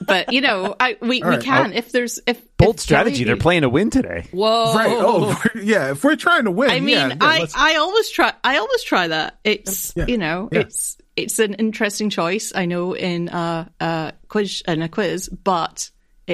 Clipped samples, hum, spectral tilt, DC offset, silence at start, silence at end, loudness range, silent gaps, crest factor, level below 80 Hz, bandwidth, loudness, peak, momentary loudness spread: under 0.1%; none; -4 dB/octave; under 0.1%; 0 s; 0 s; 6 LU; none; 18 dB; -40 dBFS; 15.5 kHz; -18 LUFS; 0 dBFS; 8 LU